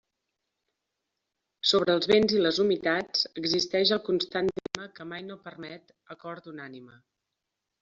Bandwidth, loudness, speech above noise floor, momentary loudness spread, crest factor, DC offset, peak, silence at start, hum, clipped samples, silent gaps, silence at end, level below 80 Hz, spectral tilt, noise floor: 7.8 kHz; -26 LUFS; 57 dB; 20 LU; 26 dB; under 0.1%; -4 dBFS; 1.65 s; none; under 0.1%; none; 0.95 s; -66 dBFS; -2.5 dB/octave; -85 dBFS